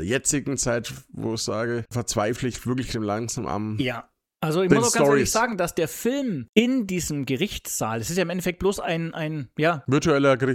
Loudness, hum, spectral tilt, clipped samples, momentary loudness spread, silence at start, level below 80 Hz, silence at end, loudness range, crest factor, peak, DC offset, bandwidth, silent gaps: -24 LUFS; none; -4.5 dB/octave; under 0.1%; 9 LU; 0 s; -48 dBFS; 0 s; 5 LU; 22 dB; -2 dBFS; under 0.1%; 17 kHz; 6.49-6.53 s